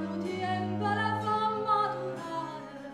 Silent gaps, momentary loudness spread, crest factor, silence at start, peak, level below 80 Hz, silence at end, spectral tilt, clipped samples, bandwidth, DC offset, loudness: none; 9 LU; 14 dB; 0 s; -16 dBFS; -74 dBFS; 0 s; -6.5 dB/octave; under 0.1%; 12.5 kHz; under 0.1%; -31 LUFS